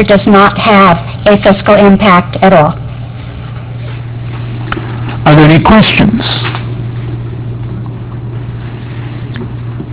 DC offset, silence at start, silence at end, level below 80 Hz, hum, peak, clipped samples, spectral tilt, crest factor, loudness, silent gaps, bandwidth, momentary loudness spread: under 0.1%; 0 s; 0 s; -28 dBFS; none; 0 dBFS; 2%; -10.5 dB/octave; 8 dB; -7 LUFS; none; 4 kHz; 17 LU